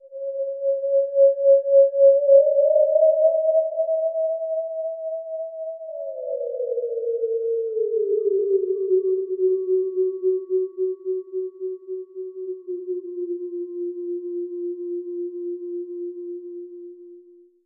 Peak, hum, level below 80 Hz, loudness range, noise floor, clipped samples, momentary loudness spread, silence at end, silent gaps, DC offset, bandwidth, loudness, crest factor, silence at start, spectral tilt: -4 dBFS; none; under -90 dBFS; 14 LU; -50 dBFS; under 0.1%; 17 LU; 0.45 s; none; under 0.1%; 1.2 kHz; -22 LUFS; 18 dB; 0.05 s; -10.5 dB/octave